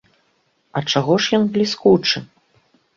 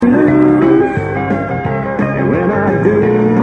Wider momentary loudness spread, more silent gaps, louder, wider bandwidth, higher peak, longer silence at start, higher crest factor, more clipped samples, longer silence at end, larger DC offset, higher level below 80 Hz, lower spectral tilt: about the same, 9 LU vs 8 LU; neither; second, -18 LUFS vs -12 LUFS; first, 7.6 kHz vs 6.4 kHz; about the same, -2 dBFS vs 0 dBFS; first, 0.75 s vs 0 s; first, 18 dB vs 12 dB; neither; first, 0.7 s vs 0 s; neither; second, -58 dBFS vs -38 dBFS; second, -5 dB/octave vs -9.5 dB/octave